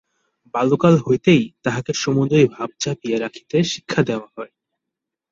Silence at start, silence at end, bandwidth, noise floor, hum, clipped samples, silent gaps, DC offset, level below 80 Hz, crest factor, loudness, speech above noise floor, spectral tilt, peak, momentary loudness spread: 0.55 s; 0.85 s; 7.6 kHz; -83 dBFS; none; under 0.1%; none; under 0.1%; -56 dBFS; 18 dB; -19 LUFS; 65 dB; -6 dB/octave; -2 dBFS; 12 LU